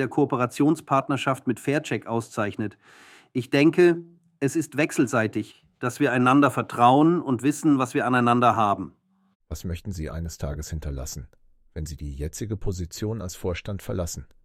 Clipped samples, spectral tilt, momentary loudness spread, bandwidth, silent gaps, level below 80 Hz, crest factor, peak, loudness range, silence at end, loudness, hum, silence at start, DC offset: under 0.1%; -6 dB/octave; 15 LU; 16 kHz; 9.35-9.40 s; -44 dBFS; 20 dB; -6 dBFS; 12 LU; 0.2 s; -24 LUFS; none; 0 s; under 0.1%